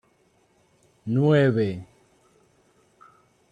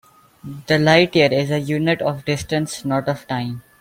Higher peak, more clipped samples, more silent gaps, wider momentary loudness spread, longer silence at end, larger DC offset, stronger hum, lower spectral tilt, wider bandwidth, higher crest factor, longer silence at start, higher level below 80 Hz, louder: second, -8 dBFS vs -2 dBFS; neither; neither; first, 20 LU vs 12 LU; first, 1.7 s vs 0.2 s; neither; neither; first, -9 dB/octave vs -5.5 dB/octave; second, 9.2 kHz vs 16.5 kHz; about the same, 18 dB vs 18 dB; first, 1.05 s vs 0.45 s; second, -66 dBFS vs -52 dBFS; second, -22 LUFS vs -19 LUFS